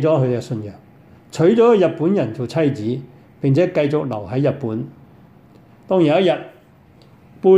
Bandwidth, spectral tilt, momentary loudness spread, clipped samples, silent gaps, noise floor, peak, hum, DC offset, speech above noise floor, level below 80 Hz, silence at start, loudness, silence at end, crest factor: 11 kHz; -8 dB/octave; 15 LU; under 0.1%; none; -48 dBFS; -2 dBFS; none; under 0.1%; 31 dB; -60 dBFS; 0 s; -18 LUFS; 0 s; 16 dB